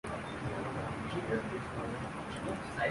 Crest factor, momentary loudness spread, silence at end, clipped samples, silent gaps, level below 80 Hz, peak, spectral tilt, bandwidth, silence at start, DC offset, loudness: 16 dB; 4 LU; 0 s; under 0.1%; none; -54 dBFS; -20 dBFS; -6 dB/octave; 11.5 kHz; 0.05 s; under 0.1%; -38 LUFS